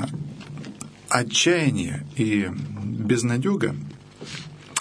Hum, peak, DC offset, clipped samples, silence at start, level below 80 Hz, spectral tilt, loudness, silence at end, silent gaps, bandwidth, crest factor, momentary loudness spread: none; -2 dBFS; under 0.1%; under 0.1%; 0 s; -58 dBFS; -4.5 dB/octave; -23 LUFS; 0 s; none; 11 kHz; 22 dB; 18 LU